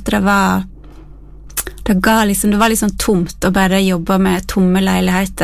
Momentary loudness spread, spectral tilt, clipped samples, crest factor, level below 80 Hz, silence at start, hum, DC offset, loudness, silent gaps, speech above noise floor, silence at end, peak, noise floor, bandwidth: 8 LU; -5 dB/octave; under 0.1%; 14 dB; -32 dBFS; 0 s; none; under 0.1%; -14 LUFS; none; 22 dB; 0 s; 0 dBFS; -35 dBFS; 16 kHz